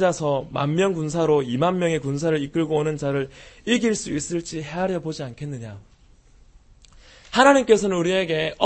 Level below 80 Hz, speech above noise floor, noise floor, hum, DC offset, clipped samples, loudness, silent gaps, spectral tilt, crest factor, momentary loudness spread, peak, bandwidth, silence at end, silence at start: -52 dBFS; 31 dB; -52 dBFS; none; under 0.1%; under 0.1%; -22 LUFS; none; -5 dB/octave; 22 dB; 15 LU; 0 dBFS; 8.8 kHz; 0 s; 0 s